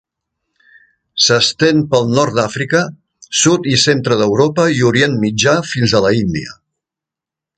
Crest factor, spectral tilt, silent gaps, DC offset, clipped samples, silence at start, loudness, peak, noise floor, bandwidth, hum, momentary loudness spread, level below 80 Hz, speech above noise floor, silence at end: 14 dB; -4 dB/octave; none; under 0.1%; under 0.1%; 1.15 s; -13 LUFS; 0 dBFS; -86 dBFS; 9.4 kHz; none; 6 LU; -46 dBFS; 72 dB; 1.05 s